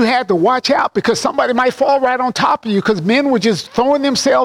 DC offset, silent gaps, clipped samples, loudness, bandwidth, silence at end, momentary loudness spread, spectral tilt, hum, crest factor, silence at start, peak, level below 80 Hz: under 0.1%; none; under 0.1%; -14 LUFS; 16 kHz; 0 s; 2 LU; -4.5 dB/octave; none; 10 dB; 0 s; -4 dBFS; -52 dBFS